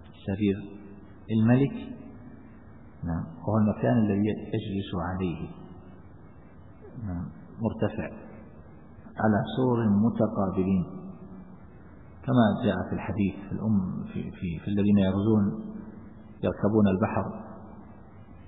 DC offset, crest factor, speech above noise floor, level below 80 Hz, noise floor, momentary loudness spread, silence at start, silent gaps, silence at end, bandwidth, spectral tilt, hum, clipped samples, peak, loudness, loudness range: 0.2%; 18 dB; 24 dB; -54 dBFS; -50 dBFS; 23 LU; 0 s; none; 0 s; 4 kHz; -12 dB/octave; none; under 0.1%; -10 dBFS; -27 LUFS; 8 LU